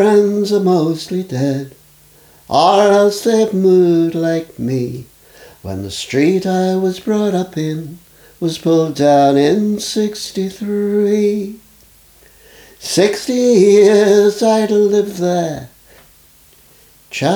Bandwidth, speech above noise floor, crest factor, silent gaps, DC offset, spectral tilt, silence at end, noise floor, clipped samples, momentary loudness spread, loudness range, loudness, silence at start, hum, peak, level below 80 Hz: over 20 kHz; 34 dB; 14 dB; none; under 0.1%; -5.5 dB/octave; 0 s; -47 dBFS; under 0.1%; 13 LU; 6 LU; -14 LUFS; 0 s; none; 0 dBFS; -54 dBFS